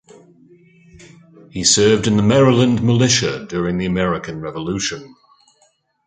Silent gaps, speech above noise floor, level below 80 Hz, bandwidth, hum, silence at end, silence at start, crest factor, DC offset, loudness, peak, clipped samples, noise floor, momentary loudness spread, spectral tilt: none; 44 dB; -46 dBFS; 9.6 kHz; none; 0.95 s; 1.55 s; 16 dB; under 0.1%; -16 LUFS; -2 dBFS; under 0.1%; -60 dBFS; 12 LU; -4.5 dB/octave